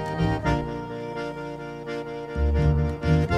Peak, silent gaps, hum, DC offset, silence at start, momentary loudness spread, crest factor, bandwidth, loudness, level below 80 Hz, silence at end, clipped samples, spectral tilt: -10 dBFS; none; none; under 0.1%; 0 s; 11 LU; 14 dB; 9.2 kHz; -27 LUFS; -32 dBFS; 0 s; under 0.1%; -8 dB/octave